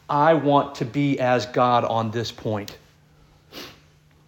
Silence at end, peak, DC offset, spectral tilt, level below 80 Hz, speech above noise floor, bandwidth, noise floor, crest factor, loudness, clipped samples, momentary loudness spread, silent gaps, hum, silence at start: 0.55 s; -4 dBFS; under 0.1%; -6.5 dB/octave; -60 dBFS; 34 dB; 17 kHz; -55 dBFS; 18 dB; -22 LUFS; under 0.1%; 21 LU; none; none; 0.1 s